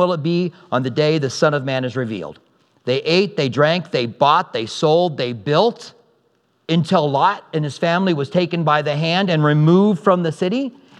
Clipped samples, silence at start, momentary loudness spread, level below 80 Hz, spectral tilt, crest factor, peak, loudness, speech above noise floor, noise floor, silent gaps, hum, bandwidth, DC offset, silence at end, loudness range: under 0.1%; 0 s; 9 LU; -70 dBFS; -6.5 dB/octave; 18 dB; 0 dBFS; -18 LUFS; 45 dB; -63 dBFS; none; none; 10 kHz; under 0.1%; 0.3 s; 3 LU